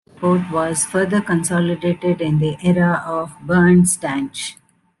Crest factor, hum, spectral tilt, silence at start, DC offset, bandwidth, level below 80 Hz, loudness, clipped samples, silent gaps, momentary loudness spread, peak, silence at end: 14 dB; none; -5.5 dB/octave; 0.2 s; under 0.1%; 12.5 kHz; -50 dBFS; -18 LUFS; under 0.1%; none; 11 LU; -4 dBFS; 0.45 s